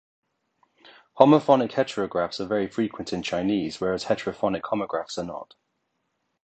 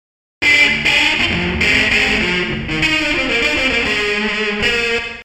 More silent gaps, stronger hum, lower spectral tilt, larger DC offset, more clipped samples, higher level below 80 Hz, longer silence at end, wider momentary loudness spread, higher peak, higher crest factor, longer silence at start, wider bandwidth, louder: neither; neither; first, -6 dB/octave vs -3 dB/octave; neither; neither; second, -60 dBFS vs -34 dBFS; first, 1 s vs 0 s; first, 12 LU vs 6 LU; about the same, 0 dBFS vs 0 dBFS; first, 24 dB vs 16 dB; first, 1.15 s vs 0.4 s; second, 8.8 kHz vs 15.5 kHz; second, -24 LUFS vs -14 LUFS